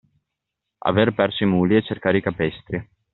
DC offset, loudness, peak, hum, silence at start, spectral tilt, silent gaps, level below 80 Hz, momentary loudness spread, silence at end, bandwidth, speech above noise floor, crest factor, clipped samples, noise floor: under 0.1%; -21 LUFS; -2 dBFS; none; 0.85 s; -5 dB/octave; none; -54 dBFS; 11 LU; 0.3 s; 4.2 kHz; 62 dB; 20 dB; under 0.1%; -82 dBFS